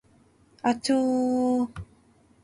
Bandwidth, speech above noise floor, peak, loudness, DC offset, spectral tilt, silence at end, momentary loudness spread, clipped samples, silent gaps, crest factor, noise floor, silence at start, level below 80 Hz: 11 kHz; 36 dB; -12 dBFS; -25 LUFS; under 0.1%; -5 dB/octave; 0.6 s; 8 LU; under 0.1%; none; 16 dB; -60 dBFS; 0.65 s; -56 dBFS